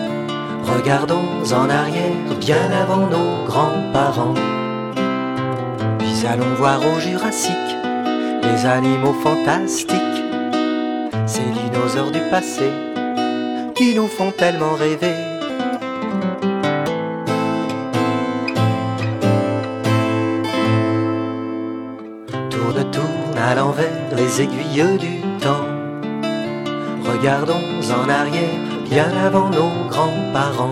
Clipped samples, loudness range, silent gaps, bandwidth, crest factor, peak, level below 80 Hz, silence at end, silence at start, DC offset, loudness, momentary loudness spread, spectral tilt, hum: under 0.1%; 3 LU; none; 16.5 kHz; 18 dB; -2 dBFS; -58 dBFS; 0 s; 0 s; under 0.1%; -19 LUFS; 7 LU; -5.5 dB/octave; none